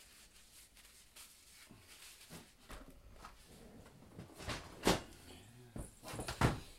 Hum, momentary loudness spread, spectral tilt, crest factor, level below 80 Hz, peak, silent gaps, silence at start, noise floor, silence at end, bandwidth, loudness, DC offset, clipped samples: none; 23 LU; -4.5 dB/octave; 30 dB; -56 dBFS; -16 dBFS; none; 0 s; -63 dBFS; 0 s; 16 kHz; -41 LUFS; under 0.1%; under 0.1%